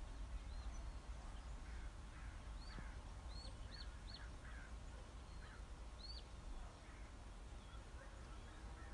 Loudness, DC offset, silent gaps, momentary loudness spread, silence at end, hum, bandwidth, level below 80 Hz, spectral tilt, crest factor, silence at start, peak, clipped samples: -56 LUFS; under 0.1%; none; 4 LU; 0 s; none; 11 kHz; -54 dBFS; -4.5 dB/octave; 12 dB; 0 s; -40 dBFS; under 0.1%